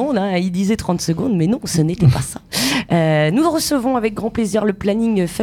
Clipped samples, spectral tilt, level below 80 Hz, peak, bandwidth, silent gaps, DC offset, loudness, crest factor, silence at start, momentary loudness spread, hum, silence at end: under 0.1%; -5.5 dB/octave; -42 dBFS; -2 dBFS; 18.5 kHz; none; under 0.1%; -17 LUFS; 16 dB; 0 s; 5 LU; none; 0 s